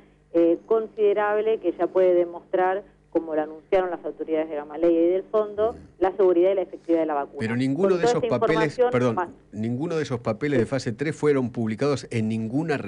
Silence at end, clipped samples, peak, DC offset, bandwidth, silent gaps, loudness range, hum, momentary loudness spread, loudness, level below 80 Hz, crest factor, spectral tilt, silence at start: 0 s; under 0.1%; -12 dBFS; under 0.1%; 10.5 kHz; none; 2 LU; 50 Hz at -55 dBFS; 8 LU; -24 LUFS; -58 dBFS; 12 dB; -7 dB/octave; 0.35 s